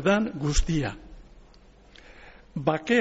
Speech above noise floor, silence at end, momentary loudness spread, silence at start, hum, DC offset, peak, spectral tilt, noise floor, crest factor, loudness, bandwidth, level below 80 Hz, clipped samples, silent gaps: 29 dB; 0 s; 25 LU; 0 s; none; under 0.1%; -10 dBFS; -5 dB/octave; -53 dBFS; 18 dB; -27 LUFS; 8 kHz; -36 dBFS; under 0.1%; none